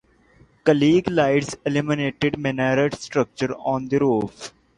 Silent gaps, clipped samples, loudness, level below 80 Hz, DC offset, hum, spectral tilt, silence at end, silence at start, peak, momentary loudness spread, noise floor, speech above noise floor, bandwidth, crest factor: none; under 0.1%; -21 LUFS; -54 dBFS; under 0.1%; none; -6 dB/octave; 0.3 s; 0.65 s; -4 dBFS; 7 LU; -55 dBFS; 34 dB; 11 kHz; 18 dB